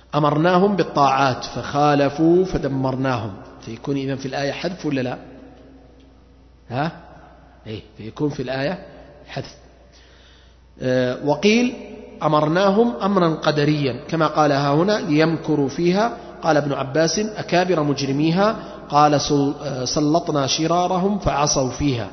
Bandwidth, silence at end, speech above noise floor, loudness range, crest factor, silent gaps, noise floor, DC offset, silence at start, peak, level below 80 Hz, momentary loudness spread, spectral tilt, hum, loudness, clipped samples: 6.4 kHz; 0 s; 30 dB; 11 LU; 18 dB; none; -49 dBFS; under 0.1%; 0.15 s; -2 dBFS; -46 dBFS; 14 LU; -5.5 dB/octave; none; -20 LUFS; under 0.1%